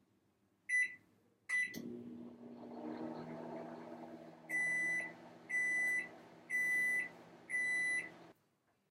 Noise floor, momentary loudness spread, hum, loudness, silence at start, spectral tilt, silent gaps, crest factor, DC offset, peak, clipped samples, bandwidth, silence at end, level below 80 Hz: -79 dBFS; 20 LU; none; -37 LUFS; 0.7 s; -3 dB/octave; none; 14 dB; under 0.1%; -28 dBFS; under 0.1%; 16 kHz; 0.6 s; -90 dBFS